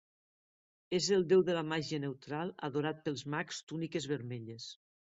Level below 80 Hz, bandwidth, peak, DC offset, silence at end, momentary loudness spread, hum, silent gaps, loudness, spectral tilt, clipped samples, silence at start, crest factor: -74 dBFS; 8 kHz; -16 dBFS; under 0.1%; 0.3 s; 15 LU; none; 3.63-3.67 s; -35 LUFS; -5 dB/octave; under 0.1%; 0.9 s; 18 dB